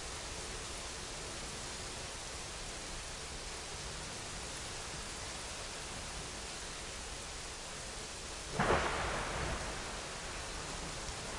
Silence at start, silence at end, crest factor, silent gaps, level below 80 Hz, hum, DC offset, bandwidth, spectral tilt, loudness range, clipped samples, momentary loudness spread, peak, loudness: 0 s; 0 s; 24 dB; none; -50 dBFS; none; under 0.1%; 11.5 kHz; -2.5 dB/octave; 5 LU; under 0.1%; 7 LU; -18 dBFS; -41 LUFS